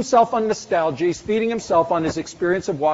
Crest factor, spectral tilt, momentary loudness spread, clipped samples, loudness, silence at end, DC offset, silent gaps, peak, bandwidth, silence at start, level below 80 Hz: 16 dB; -4.5 dB/octave; 5 LU; under 0.1%; -21 LUFS; 0 s; under 0.1%; none; -4 dBFS; 8 kHz; 0 s; -52 dBFS